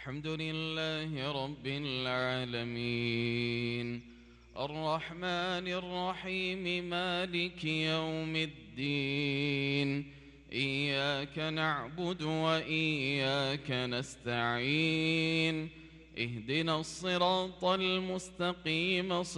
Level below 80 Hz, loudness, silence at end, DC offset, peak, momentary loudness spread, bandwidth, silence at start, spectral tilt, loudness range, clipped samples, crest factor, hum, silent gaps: -62 dBFS; -33 LUFS; 0 s; under 0.1%; -16 dBFS; 8 LU; 11.5 kHz; 0 s; -5 dB/octave; 3 LU; under 0.1%; 18 dB; none; none